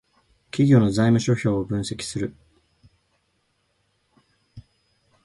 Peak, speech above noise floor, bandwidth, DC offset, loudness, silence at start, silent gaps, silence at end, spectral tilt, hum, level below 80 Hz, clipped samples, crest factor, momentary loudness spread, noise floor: -4 dBFS; 50 dB; 11.5 kHz; under 0.1%; -22 LUFS; 0.55 s; none; 0.65 s; -6.5 dB/octave; none; -52 dBFS; under 0.1%; 20 dB; 13 LU; -70 dBFS